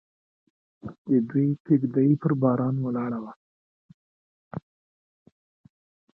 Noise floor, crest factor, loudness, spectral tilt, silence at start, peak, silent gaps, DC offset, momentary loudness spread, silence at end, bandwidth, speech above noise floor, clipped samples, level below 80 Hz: under -90 dBFS; 18 dB; -24 LUFS; -13 dB/octave; 0.85 s; -8 dBFS; 0.98-1.05 s, 1.60-1.65 s, 3.36-4.51 s; under 0.1%; 18 LU; 1.55 s; 2.6 kHz; over 66 dB; under 0.1%; -68 dBFS